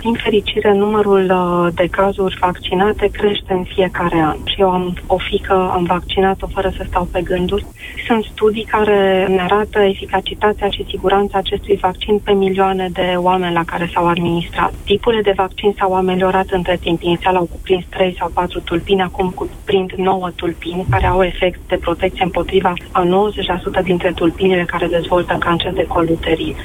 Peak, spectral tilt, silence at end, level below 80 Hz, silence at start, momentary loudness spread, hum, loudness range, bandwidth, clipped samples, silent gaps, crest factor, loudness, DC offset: -2 dBFS; -6.5 dB/octave; 0 s; -32 dBFS; 0 s; 6 LU; none; 2 LU; 16 kHz; under 0.1%; none; 14 dB; -16 LUFS; under 0.1%